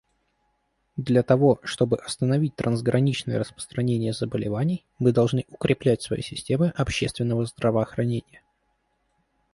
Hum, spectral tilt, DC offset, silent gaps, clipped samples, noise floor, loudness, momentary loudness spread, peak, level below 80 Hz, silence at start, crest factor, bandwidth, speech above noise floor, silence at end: none; -6.5 dB/octave; under 0.1%; none; under 0.1%; -72 dBFS; -24 LUFS; 8 LU; -6 dBFS; -50 dBFS; 0.95 s; 20 dB; 11.5 kHz; 48 dB; 1.35 s